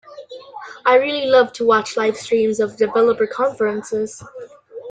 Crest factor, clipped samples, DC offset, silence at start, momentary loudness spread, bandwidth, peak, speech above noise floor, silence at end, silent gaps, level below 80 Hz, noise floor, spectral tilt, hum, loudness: 16 dB; under 0.1%; under 0.1%; 0.1 s; 22 LU; 9.4 kHz; -2 dBFS; 20 dB; 0 s; none; -62 dBFS; -37 dBFS; -4 dB/octave; none; -18 LUFS